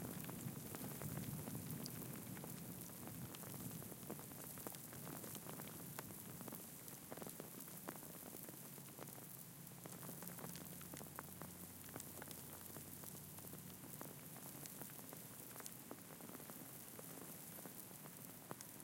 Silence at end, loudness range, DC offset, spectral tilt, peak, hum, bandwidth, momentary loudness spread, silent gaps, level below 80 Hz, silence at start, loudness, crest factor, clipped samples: 0 s; 3 LU; under 0.1%; -4 dB/octave; -28 dBFS; none; 17 kHz; 5 LU; none; -78 dBFS; 0 s; -52 LUFS; 26 dB; under 0.1%